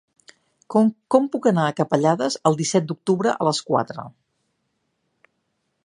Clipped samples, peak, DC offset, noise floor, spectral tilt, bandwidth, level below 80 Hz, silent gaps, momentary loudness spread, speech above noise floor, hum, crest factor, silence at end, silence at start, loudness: under 0.1%; -2 dBFS; under 0.1%; -73 dBFS; -5.5 dB/octave; 11 kHz; -68 dBFS; none; 4 LU; 53 dB; none; 22 dB; 1.75 s; 0.7 s; -21 LUFS